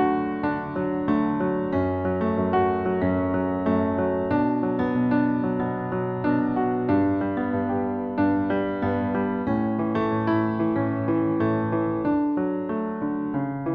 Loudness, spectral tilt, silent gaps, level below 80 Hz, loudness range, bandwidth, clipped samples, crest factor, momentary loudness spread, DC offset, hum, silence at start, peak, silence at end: -24 LUFS; -10.5 dB/octave; none; -52 dBFS; 1 LU; 4.9 kHz; under 0.1%; 14 dB; 5 LU; under 0.1%; none; 0 s; -10 dBFS; 0 s